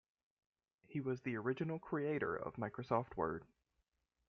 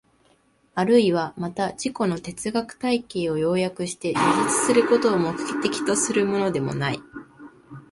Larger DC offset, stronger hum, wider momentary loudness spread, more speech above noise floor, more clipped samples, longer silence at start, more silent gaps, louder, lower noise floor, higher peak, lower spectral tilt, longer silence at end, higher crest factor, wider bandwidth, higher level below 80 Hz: neither; neither; second, 6 LU vs 10 LU; first, 45 dB vs 39 dB; neither; first, 0.9 s vs 0.75 s; neither; second, -42 LUFS vs -23 LUFS; first, -85 dBFS vs -61 dBFS; second, -22 dBFS vs -6 dBFS; first, -7 dB/octave vs -4.5 dB/octave; first, 0.85 s vs 0.1 s; about the same, 22 dB vs 18 dB; second, 6.6 kHz vs 11.5 kHz; second, -72 dBFS vs -60 dBFS